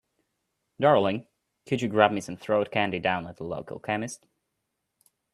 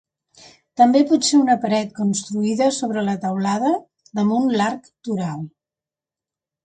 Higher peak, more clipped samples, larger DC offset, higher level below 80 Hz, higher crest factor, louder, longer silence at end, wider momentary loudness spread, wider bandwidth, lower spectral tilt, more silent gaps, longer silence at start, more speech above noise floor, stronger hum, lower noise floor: about the same, -2 dBFS vs -2 dBFS; neither; neither; about the same, -66 dBFS vs -66 dBFS; first, 26 dB vs 18 dB; second, -26 LUFS vs -19 LUFS; about the same, 1.15 s vs 1.15 s; about the same, 14 LU vs 13 LU; first, 13 kHz vs 9.4 kHz; about the same, -5.5 dB/octave vs -5 dB/octave; neither; about the same, 0.8 s vs 0.8 s; second, 55 dB vs 71 dB; neither; second, -81 dBFS vs -89 dBFS